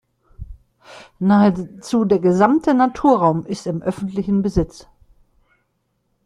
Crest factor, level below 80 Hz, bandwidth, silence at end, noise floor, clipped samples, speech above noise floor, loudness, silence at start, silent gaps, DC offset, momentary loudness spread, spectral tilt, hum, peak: 18 dB; -42 dBFS; 11 kHz; 1.45 s; -69 dBFS; under 0.1%; 52 dB; -18 LUFS; 0.4 s; none; under 0.1%; 10 LU; -7.5 dB/octave; none; -2 dBFS